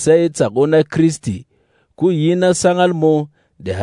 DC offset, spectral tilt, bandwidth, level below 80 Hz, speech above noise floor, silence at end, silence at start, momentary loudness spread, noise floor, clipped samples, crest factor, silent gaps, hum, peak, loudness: under 0.1%; -6 dB/octave; 11 kHz; -54 dBFS; 45 dB; 0 s; 0 s; 12 LU; -59 dBFS; under 0.1%; 14 dB; none; none; -2 dBFS; -15 LUFS